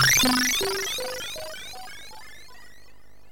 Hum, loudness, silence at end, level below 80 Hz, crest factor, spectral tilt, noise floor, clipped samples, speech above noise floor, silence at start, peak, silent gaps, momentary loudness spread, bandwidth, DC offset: none; -23 LUFS; 0.65 s; -50 dBFS; 18 dB; -1.5 dB/octave; -56 dBFS; under 0.1%; 30 dB; 0 s; -8 dBFS; none; 24 LU; 17 kHz; 0.9%